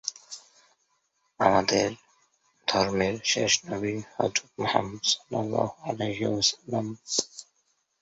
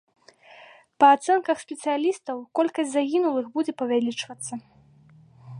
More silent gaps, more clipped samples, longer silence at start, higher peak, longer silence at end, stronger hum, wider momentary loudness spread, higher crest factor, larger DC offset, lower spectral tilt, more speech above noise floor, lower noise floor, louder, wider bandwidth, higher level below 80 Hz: neither; neither; second, 0.05 s vs 1 s; about the same, -4 dBFS vs -4 dBFS; first, 0.6 s vs 0 s; neither; second, 11 LU vs 15 LU; about the same, 24 dB vs 20 dB; neither; about the same, -3 dB/octave vs -4 dB/octave; first, 46 dB vs 31 dB; first, -73 dBFS vs -54 dBFS; second, -27 LUFS vs -24 LUFS; second, 8.2 kHz vs 11.5 kHz; first, -60 dBFS vs -76 dBFS